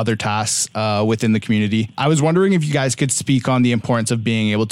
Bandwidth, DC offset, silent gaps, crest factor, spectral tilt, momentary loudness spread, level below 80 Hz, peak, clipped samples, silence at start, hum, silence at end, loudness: 15.5 kHz; under 0.1%; none; 14 dB; -5 dB/octave; 4 LU; -56 dBFS; -4 dBFS; under 0.1%; 0 s; none; 0 s; -18 LUFS